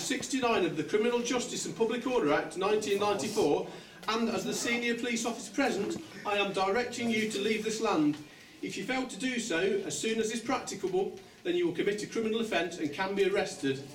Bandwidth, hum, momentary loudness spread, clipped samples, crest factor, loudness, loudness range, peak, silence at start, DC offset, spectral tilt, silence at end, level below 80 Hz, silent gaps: 17 kHz; none; 6 LU; under 0.1%; 16 dB; -31 LUFS; 2 LU; -16 dBFS; 0 s; under 0.1%; -3.5 dB/octave; 0 s; -66 dBFS; none